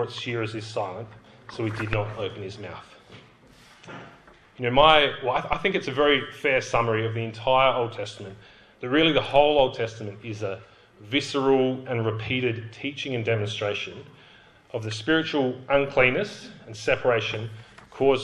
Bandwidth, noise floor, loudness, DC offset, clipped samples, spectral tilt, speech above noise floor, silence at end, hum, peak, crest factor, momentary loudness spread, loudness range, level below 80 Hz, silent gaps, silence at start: 11 kHz; -53 dBFS; -24 LUFS; under 0.1%; under 0.1%; -5.5 dB/octave; 28 dB; 0 s; none; -4 dBFS; 22 dB; 19 LU; 10 LU; -52 dBFS; none; 0 s